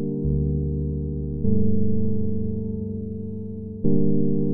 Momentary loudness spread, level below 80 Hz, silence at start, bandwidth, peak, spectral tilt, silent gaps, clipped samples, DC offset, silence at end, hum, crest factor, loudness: 9 LU; -34 dBFS; 0 s; 1 kHz; -6 dBFS; -19.5 dB/octave; none; under 0.1%; under 0.1%; 0 s; none; 16 dB; -26 LUFS